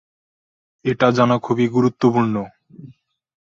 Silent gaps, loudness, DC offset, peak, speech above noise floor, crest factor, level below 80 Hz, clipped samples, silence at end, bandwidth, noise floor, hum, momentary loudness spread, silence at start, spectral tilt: none; -18 LUFS; under 0.1%; -2 dBFS; 30 dB; 18 dB; -56 dBFS; under 0.1%; 0.55 s; 7.4 kHz; -47 dBFS; none; 11 LU; 0.85 s; -7.5 dB/octave